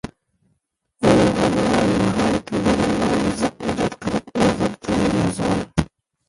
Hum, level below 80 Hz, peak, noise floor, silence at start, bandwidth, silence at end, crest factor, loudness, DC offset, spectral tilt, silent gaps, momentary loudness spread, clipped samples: none; -40 dBFS; -2 dBFS; -70 dBFS; 0.05 s; 11.5 kHz; 0.45 s; 18 dB; -20 LUFS; under 0.1%; -6 dB/octave; none; 7 LU; under 0.1%